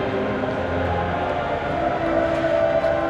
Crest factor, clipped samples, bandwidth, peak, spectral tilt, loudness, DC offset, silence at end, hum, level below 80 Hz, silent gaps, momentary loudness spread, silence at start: 12 dB; under 0.1%; 8.8 kHz; -8 dBFS; -7 dB/octave; -22 LUFS; under 0.1%; 0 s; none; -42 dBFS; none; 4 LU; 0 s